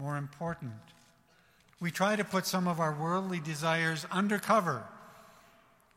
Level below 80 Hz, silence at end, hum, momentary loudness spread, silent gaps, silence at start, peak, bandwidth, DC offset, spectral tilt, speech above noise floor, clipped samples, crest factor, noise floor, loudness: -72 dBFS; 0.75 s; none; 13 LU; none; 0 s; -14 dBFS; 16 kHz; under 0.1%; -5 dB/octave; 33 dB; under 0.1%; 20 dB; -65 dBFS; -32 LUFS